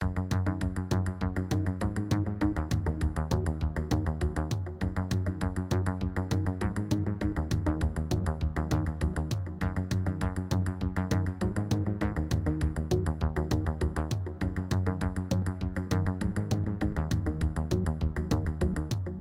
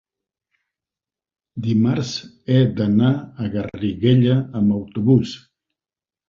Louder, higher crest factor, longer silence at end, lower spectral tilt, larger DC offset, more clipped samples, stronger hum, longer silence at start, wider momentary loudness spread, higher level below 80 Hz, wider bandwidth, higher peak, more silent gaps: second, -31 LUFS vs -19 LUFS; about the same, 18 dB vs 18 dB; second, 0 s vs 0.95 s; about the same, -7 dB/octave vs -8 dB/octave; neither; neither; neither; second, 0 s vs 1.55 s; second, 3 LU vs 12 LU; first, -36 dBFS vs -50 dBFS; first, 16 kHz vs 7.4 kHz; second, -12 dBFS vs -2 dBFS; neither